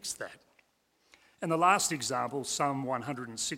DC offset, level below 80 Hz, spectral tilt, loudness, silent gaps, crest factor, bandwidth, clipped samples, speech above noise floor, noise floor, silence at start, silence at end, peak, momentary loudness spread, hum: under 0.1%; -72 dBFS; -3 dB/octave; -31 LUFS; none; 22 dB; 16.5 kHz; under 0.1%; 41 dB; -72 dBFS; 0.05 s; 0 s; -10 dBFS; 14 LU; none